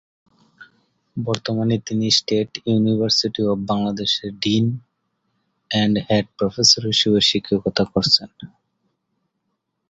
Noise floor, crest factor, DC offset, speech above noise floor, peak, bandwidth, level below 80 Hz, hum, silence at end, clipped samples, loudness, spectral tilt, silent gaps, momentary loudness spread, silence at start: -75 dBFS; 20 dB; under 0.1%; 55 dB; 0 dBFS; 8 kHz; -52 dBFS; none; 1.45 s; under 0.1%; -19 LUFS; -4 dB/octave; none; 9 LU; 0.6 s